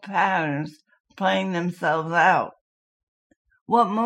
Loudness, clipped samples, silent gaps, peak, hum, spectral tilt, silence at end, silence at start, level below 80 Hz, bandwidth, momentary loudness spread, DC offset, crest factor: -22 LUFS; under 0.1%; 1.00-1.04 s, 2.61-3.30 s, 3.36-3.45 s, 3.61-3.66 s; -4 dBFS; none; -6 dB/octave; 0 s; 0.05 s; -76 dBFS; 12.5 kHz; 10 LU; under 0.1%; 18 dB